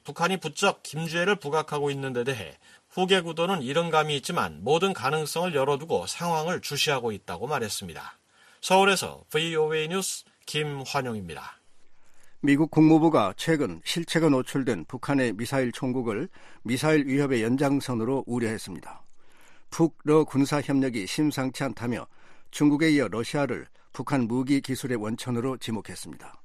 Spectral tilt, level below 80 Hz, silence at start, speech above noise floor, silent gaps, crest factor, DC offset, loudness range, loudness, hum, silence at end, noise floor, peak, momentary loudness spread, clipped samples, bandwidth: -5 dB/octave; -60 dBFS; 0.05 s; 22 dB; none; 18 dB; under 0.1%; 4 LU; -26 LUFS; none; 0 s; -48 dBFS; -8 dBFS; 13 LU; under 0.1%; 15 kHz